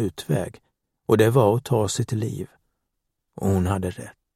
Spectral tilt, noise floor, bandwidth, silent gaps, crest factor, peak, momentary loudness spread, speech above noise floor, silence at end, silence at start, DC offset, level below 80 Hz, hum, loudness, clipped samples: -6.5 dB/octave; -78 dBFS; 16 kHz; none; 20 dB; -4 dBFS; 17 LU; 56 dB; 0.25 s; 0 s; under 0.1%; -52 dBFS; none; -23 LUFS; under 0.1%